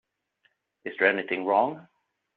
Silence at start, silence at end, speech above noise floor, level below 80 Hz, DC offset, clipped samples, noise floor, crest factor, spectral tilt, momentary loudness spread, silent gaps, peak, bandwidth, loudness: 0.85 s; 0.55 s; 46 dB; -78 dBFS; under 0.1%; under 0.1%; -71 dBFS; 22 dB; -2 dB/octave; 17 LU; none; -6 dBFS; 4.7 kHz; -25 LUFS